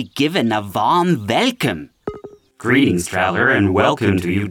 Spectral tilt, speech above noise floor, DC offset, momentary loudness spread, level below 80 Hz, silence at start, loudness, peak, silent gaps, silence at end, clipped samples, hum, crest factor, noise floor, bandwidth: -5.5 dB/octave; 22 dB; under 0.1%; 13 LU; -50 dBFS; 0 s; -17 LUFS; -4 dBFS; none; 0 s; under 0.1%; none; 14 dB; -38 dBFS; 18 kHz